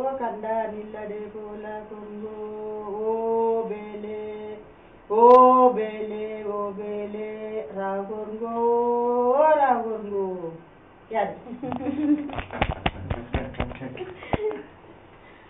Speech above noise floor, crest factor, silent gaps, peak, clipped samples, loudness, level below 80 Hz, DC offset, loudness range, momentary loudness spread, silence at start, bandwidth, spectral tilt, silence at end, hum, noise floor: 27 dB; 22 dB; none; -4 dBFS; under 0.1%; -24 LUFS; -46 dBFS; under 0.1%; 9 LU; 17 LU; 0 s; 4.3 kHz; -5 dB/octave; 0.15 s; none; -50 dBFS